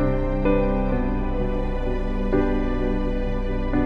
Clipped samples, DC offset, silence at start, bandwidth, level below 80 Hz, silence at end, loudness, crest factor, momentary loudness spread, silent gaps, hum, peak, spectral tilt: under 0.1%; under 0.1%; 0 s; 5.2 kHz; -24 dBFS; 0 s; -25 LUFS; 14 dB; 5 LU; none; none; -8 dBFS; -9.5 dB/octave